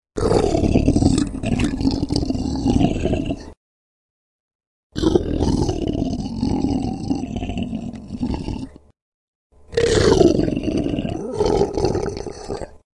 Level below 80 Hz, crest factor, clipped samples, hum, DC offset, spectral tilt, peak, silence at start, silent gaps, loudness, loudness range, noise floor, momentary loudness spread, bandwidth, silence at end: -32 dBFS; 20 dB; under 0.1%; none; under 0.1%; -6.5 dB/octave; 0 dBFS; 0.15 s; 3.57-4.59 s, 4.67-4.90 s, 9.02-9.50 s; -21 LUFS; 6 LU; under -90 dBFS; 13 LU; 11.5 kHz; 0.2 s